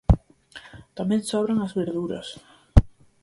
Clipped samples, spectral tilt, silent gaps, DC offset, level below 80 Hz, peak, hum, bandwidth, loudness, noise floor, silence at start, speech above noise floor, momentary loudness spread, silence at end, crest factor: under 0.1%; -7 dB/octave; none; under 0.1%; -28 dBFS; 0 dBFS; none; 11.5 kHz; -25 LUFS; -47 dBFS; 0.1 s; 22 dB; 23 LU; 0.35 s; 24 dB